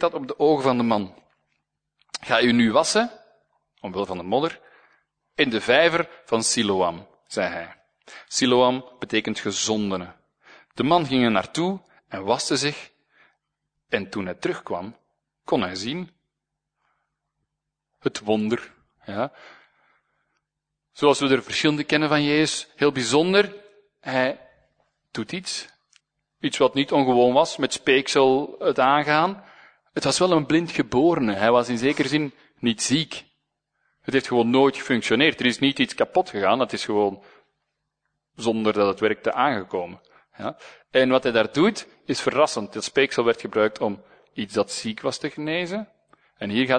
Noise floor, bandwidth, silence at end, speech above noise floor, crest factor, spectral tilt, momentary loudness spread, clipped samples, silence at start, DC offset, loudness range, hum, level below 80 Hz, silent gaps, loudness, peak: -83 dBFS; 9.6 kHz; 0 s; 61 dB; 22 dB; -4 dB/octave; 15 LU; under 0.1%; 0 s; under 0.1%; 9 LU; 50 Hz at -65 dBFS; -62 dBFS; none; -22 LUFS; -2 dBFS